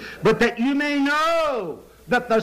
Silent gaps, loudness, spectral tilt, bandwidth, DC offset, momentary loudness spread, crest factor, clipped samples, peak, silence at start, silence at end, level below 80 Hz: none; -21 LUFS; -5 dB/octave; 15.5 kHz; under 0.1%; 10 LU; 10 dB; under 0.1%; -10 dBFS; 0 s; 0 s; -50 dBFS